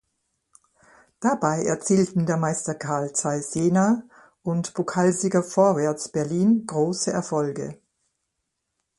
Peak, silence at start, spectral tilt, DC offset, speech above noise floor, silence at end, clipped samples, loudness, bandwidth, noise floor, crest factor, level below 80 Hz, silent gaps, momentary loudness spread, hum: -6 dBFS; 1.2 s; -5.5 dB/octave; under 0.1%; 56 dB; 1.25 s; under 0.1%; -23 LUFS; 11.5 kHz; -79 dBFS; 18 dB; -64 dBFS; none; 7 LU; none